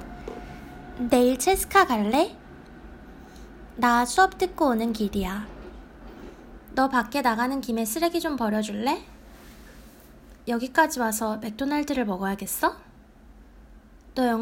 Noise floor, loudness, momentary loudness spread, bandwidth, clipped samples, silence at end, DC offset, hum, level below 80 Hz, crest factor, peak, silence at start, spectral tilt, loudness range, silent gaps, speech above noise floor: -50 dBFS; -25 LUFS; 25 LU; 16.5 kHz; under 0.1%; 0 s; under 0.1%; none; -48 dBFS; 22 dB; -4 dBFS; 0 s; -4 dB/octave; 4 LU; none; 26 dB